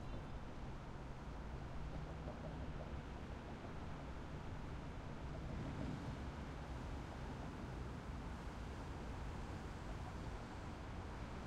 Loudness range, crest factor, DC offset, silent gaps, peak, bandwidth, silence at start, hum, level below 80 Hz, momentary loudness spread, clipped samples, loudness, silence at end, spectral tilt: 2 LU; 14 dB; under 0.1%; none; -34 dBFS; 12.5 kHz; 0 s; none; -52 dBFS; 3 LU; under 0.1%; -50 LUFS; 0 s; -6.5 dB/octave